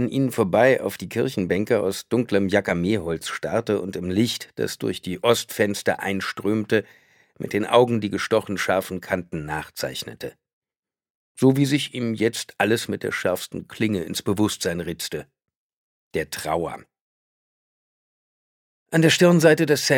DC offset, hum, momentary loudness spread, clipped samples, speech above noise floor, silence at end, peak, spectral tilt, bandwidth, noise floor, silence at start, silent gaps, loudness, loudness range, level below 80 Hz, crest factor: under 0.1%; none; 11 LU; under 0.1%; over 68 dB; 0 s; -2 dBFS; -5 dB/octave; 18.5 kHz; under -90 dBFS; 0 s; 10.53-10.62 s, 10.79-10.83 s, 11.10-11.35 s, 15.55-16.11 s, 17.01-18.86 s; -23 LUFS; 7 LU; -56 dBFS; 20 dB